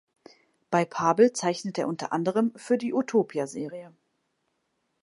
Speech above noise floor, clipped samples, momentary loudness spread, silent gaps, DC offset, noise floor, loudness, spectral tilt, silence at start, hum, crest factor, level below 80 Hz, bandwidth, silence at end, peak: 50 dB; under 0.1%; 11 LU; none; under 0.1%; -76 dBFS; -26 LUFS; -5.5 dB/octave; 0.7 s; none; 20 dB; -78 dBFS; 11.5 kHz; 1.15 s; -8 dBFS